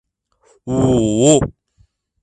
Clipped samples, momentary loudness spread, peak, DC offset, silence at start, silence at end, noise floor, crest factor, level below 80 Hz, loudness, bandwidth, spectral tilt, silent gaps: under 0.1%; 13 LU; 0 dBFS; under 0.1%; 0.65 s; 0.7 s; -58 dBFS; 18 dB; -40 dBFS; -15 LUFS; 11 kHz; -5.5 dB/octave; none